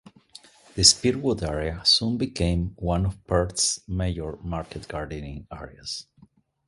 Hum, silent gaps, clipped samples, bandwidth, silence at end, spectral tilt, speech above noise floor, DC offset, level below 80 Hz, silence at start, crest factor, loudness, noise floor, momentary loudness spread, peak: none; none; under 0.1%; 11.5 kHz; 0.65 s; -3.5 dB/octave; 32 dB; under 0.1%; -38 dBFS; 0.75 s; 26 dB; -24 LUFS; -58 dBFS; 19 LU; 0 dBFS